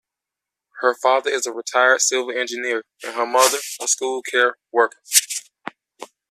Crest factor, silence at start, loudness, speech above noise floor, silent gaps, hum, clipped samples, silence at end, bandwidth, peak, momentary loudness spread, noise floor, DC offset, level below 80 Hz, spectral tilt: 22 dB; 0.75 s; -19 LUFS; 66 dB; none; none; under 0.1%; 0.25 s; 15 kHz; 0 dBFS; 12 LU; -86 dBFS; under 0.1%; -76 dBFS; 1.5 dB/octave